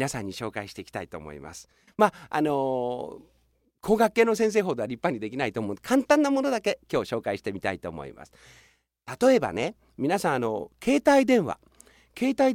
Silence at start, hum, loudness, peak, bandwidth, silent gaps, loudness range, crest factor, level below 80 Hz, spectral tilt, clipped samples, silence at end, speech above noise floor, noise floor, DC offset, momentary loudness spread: 0 s; none; -26 LUFS; -4 dBFS; 17 kHz; none; 5 LU; 22 dB; -58 dBFS; -5 dB/octave; under 0.1%; 0 s; 42 dB; -68 dBFS; under 0.1%; 18 LU